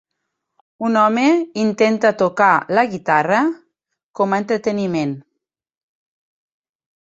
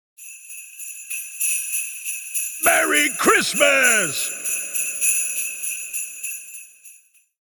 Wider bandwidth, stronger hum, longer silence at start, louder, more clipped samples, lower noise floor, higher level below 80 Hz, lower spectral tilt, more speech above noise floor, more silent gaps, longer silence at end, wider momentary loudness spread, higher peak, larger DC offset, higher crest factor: second, 8 kHz vs 19.5 kHz; neither; first, 0.8 s vs 0.2 s; about the same, -17 LUFS vs -19 LUFS; neither; first, -77 dBFS vs -52 dBFS; about the same, -64 dBFS vs -64 dBFS; first, -6 dB/octave vs 0 dB/octave; first, 61 dB vs 34 dB; first, 4.04-4.14 s vs none; first, 1.8 s vs 0.5 s; second, 8 LU vs 19 LU; about the same, -2 dBFS vs -2 dBFS; neither; about the same, 18 dB vs 20 dB